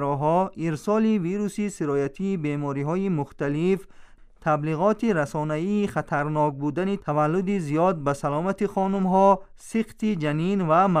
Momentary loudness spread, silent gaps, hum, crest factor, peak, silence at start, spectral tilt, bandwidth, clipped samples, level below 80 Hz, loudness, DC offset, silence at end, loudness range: 7 LU; none; none; 16 dB; -6 dBFS; 0 s; -7.5 dB/octave; 13 kHz; under 0.1%; -52 dBFS; -24 LUFS; under 0.1%; 0 s; 3 LU